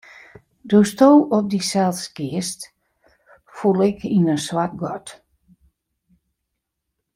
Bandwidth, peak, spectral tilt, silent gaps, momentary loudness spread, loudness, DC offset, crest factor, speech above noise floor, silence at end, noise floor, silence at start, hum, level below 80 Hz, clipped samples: 16 kHz; -2 dBFS; -6 dB/octave; none; 16 LU; -19 LUFS; under 0.1%; 20 dB; 61 dB; 2 s; -79 dBFS; 0.65 s; none; -60 dBFS; under 0.1%